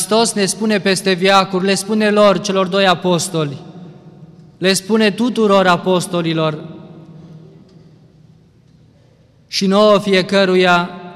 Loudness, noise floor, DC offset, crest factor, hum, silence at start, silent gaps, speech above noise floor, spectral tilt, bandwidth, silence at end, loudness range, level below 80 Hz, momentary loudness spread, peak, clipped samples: -14 LUFS; -50 dBFS; under 0.1%; 14 dB; none; 0 s; none; 36 dB; -4.5 dB/octave; 14.5 kHz; 0 s; 9 LU; -60 dBFS; 8 LU; -2 dBFS; under 0.1%